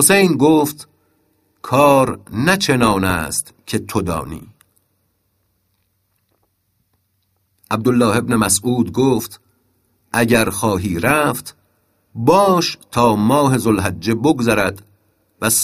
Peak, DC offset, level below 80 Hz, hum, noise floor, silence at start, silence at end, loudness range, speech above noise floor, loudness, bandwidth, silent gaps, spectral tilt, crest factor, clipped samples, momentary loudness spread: 0 dBFS; under 0.1%; -46 dBFS; none; -66 dBFS; 0 s; 0 s; 10 LU; 50 dB; -16 LUFS; 15.5 kHz; none; -4.5 dB/octave; 18 dB; under 0.1%; 12 LU